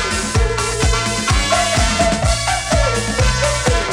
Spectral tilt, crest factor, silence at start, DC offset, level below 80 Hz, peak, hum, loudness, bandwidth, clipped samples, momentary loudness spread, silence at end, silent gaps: -3.5 dB/octave; 16 dB; 0 s; under 0.1%; -22 dBFS; 0 dBFS; none; -16 LUFS; 16 kHz; under 0.1%; 3 LU; 0 s; none